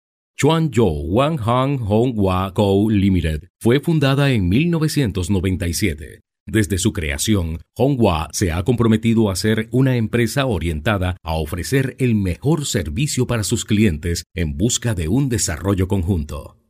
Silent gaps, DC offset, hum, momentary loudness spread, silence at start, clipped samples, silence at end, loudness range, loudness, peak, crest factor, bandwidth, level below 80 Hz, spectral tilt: 3.50-3.55 s, 6.40-6.46 s, 14.26-14.30 s; under 0.1%; none; 6 LU; 0.4 s; under 0.1%; 0.2 s; 3 LU; -19 LUFS; -4 dBFS; 14 dB; 16 kHz; -34 dBFS; -5.5 dB/octave